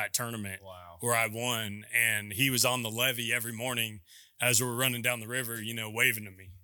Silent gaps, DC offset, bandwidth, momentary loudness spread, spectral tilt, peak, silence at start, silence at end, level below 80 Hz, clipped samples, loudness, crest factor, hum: none; under 0.1%; 19 kHz; 10 LU; -2.5 dB/octave; -10 dBFS; 0 s; 0.05 s; -70 dBFS; under 0.1%; -29 LUFS; 22 dB; none